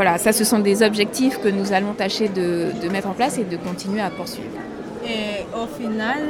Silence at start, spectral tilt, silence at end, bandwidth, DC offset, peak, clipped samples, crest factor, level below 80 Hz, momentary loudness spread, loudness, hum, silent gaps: 0 s; -4 dB/octave; 0 s; 19 kHz; under 0.1%; -2 dBFS; under 0.1%; 20 dB; -54 dBFS; 13 LU; -21 LUFS; none; none